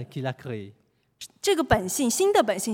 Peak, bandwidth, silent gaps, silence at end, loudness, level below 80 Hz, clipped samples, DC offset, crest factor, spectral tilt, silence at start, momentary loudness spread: -4 dBFS; 17 kHz; none; 0 s; -24 LUFS; -48 dBFS; under 0.1%; under 0.1%; 22 dB; -4 dB/octave; 0 s; 17 LU